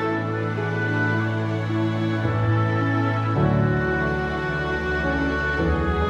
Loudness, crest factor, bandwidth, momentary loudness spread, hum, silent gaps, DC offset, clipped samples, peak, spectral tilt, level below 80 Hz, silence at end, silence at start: -23 LUFS; 14 dB; 7.4 kHz; 4 LU; none; none; under 0.1%; under 0.1%; -8 dBFS; -8 dB/octave; -36 dBFS; 0 s; 0 s